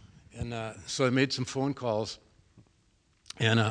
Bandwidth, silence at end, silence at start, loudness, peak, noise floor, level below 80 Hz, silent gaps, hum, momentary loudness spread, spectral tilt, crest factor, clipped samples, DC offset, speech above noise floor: 10.5 kHz; 0 s; 0 s; -30 LUFS; -10 dBFS; -68 dBFS; -58 dBFS; none; none; 18 LU; -5 dB/octave; 20 dB; under 0.1%; under 0.1%; 39 dB